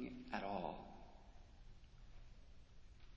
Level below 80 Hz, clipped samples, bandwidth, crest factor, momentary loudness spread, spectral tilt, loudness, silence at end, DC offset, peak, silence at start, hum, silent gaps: -62 dBFS; under 0.1%; 8 kHz; 24 dB; 21 LU; -4.5 dB/octave; -48 LUFS; 0 s; under 0.1%; -26 dBFS; 0 s; none; none